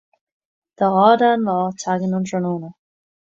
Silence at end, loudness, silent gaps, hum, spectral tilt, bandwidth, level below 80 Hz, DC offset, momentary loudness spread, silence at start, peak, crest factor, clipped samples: 0.6 s; -18 LUFS; none; none; -6 dB/octave; 7.8 kHz; -66 dBFS; under 0.1%; 12 LU; 0.8 s; -2 dBFS; 18 dB; under 0.1%